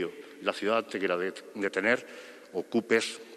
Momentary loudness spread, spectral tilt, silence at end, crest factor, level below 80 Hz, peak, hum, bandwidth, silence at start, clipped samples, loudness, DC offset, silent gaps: 11 LU; -3.5 dB/octave; 0 s; 22 dB; -80 dBFS; -10 dBFS; none; 13 kHz; 0 s; under 0.1%; -30 LUFS; under 0.1%; none